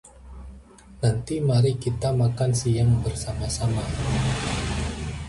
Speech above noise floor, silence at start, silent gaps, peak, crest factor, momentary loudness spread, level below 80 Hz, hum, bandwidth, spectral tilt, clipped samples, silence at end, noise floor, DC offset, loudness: 24 dB; 0.05 s; none; -10 dBFS; 14 dB; 8 LU; -36 dBFS; none; 11.5 kHz; -6 dB/octave; under 0.1%; 0 s; -46 dBFS; under 0.1%; -24 LUFS